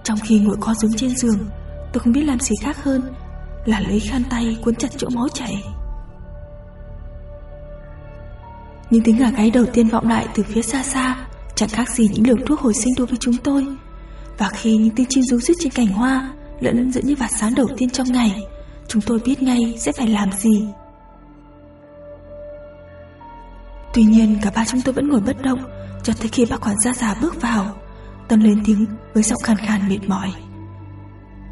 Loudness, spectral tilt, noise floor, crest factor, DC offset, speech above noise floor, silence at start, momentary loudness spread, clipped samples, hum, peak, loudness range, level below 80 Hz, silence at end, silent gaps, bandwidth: -18 LUFS; -5 dB/octave; -43 dBFS; 16 dB; under 0.1%; 26 dB; 0 s; 23 LU; under 0.1%; none; -2 dBFS; 6 LU; -36 dBFS; 0 s; none; 11.5 kHz